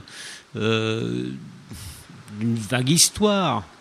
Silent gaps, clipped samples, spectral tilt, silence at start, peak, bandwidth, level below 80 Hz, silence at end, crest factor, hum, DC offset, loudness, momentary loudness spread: none; under 0.1%; -3.5 dB/octave; 0.05 s; -2 dBFS; 14.5 kHz; -52 dBFS; 0.1 s; 22 dB; none; under 0.1%; -21 LUFS; 23 LU